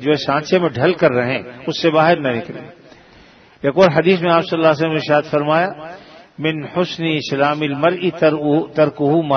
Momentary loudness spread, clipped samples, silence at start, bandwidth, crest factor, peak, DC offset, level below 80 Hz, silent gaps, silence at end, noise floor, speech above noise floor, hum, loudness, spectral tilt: 9 LU; under 0.1%; 0 s; 6.6 kHz; 16 dB; 0 dBFS; under 0.1%; -56 dBFS; none; 0 s; -46 dBFS; 30 dB; none; -16 LUFS; -6.5 dB/octave